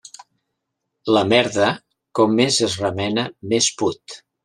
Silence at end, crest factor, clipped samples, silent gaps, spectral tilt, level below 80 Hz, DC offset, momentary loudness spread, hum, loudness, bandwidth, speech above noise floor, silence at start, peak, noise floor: 0.3 s; 18 dB; under 0.1%; none; -3.5 dB/octave; -62 dBFS; under 0.1%; 15 LU; none; -19 LUFS; 12.5 kHz; 59 dB; 1.05 s; -2 dBFS; -78 dBFS